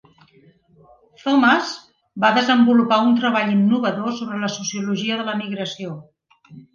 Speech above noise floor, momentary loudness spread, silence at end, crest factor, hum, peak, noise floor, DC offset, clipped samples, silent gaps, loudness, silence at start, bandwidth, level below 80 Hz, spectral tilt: 35 dB; 15 LU; 0.15 s; 18 dB; none; -2 dBFS; -54 dBFS; under 0.1%; under 0.1%; none; -19 LUFS; 1.25 s; 7.2 kHz; -68 dBFS; -4.5 dB/octave